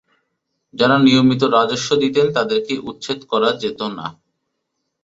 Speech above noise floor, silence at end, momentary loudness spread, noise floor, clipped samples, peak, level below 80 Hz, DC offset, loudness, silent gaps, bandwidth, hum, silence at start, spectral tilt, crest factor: 58 dB; 0.9 s; 14 LU; -75 dBFS; under 0.1%; -2 dBFS; -58 dBFS; under 0.1%; -17 LUFS; none; 8 kHz; none; 0.75 s; -5 dB/octave; 16 dB